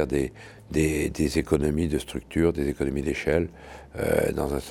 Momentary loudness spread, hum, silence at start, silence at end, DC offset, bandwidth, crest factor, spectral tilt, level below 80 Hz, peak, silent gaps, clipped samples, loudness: 9 LU; none; 0 s; 0 s; under 0.1%; 17 kHz; 20 dB; -6 dB/octave; -38 dBFS; -6 dBFS; none; under 0.1%; -26 LUFS